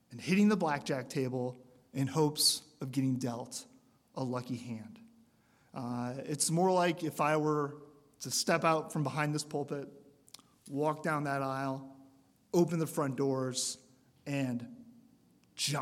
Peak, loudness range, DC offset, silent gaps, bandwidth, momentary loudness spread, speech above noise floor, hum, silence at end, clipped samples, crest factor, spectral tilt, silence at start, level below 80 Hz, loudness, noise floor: -14 dBFS; 6 LU; under 0.1%; none; 16.5 kHz; 16 LU; 35 dB; none; 0 s; under 0.1%; 20 dB; -4.5 dB/octave; 0.1 s; -78 dBFS; -33 LUFS; -68 dBFS